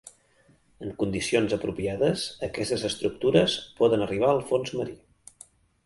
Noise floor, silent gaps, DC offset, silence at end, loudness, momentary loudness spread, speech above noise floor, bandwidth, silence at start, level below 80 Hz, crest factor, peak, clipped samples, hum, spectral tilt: -62 dBFS; none; under 0.1%; 0.9 s; -26 LUFS; 9 LU; 36 dB; 11.5 kHz; 0.05 s; -54 dBFS; 22 dB; -6 dBFS; under 0.1%; none; -5 dB/octave